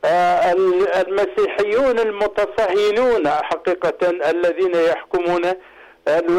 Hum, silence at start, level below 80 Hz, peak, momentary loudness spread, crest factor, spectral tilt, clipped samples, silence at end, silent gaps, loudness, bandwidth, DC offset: none; 0.05 s; -52 dBFS; -12 dBFS; 5 LU; 6 dB; -5 dB/octave; under 0.1%; 0 s; none; -18 LUFS; 12.5 kHz; under 0.1%